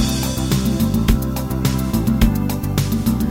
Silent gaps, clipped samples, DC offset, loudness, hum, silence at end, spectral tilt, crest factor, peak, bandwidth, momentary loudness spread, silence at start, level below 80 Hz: none; under 0.1%; under 0.1%; -19 LUFS; none; 0 s; -6 dB/octave; 16 dB; -2 dBFS; 17 kHz; 3 LU; 0 s; -24 dBFS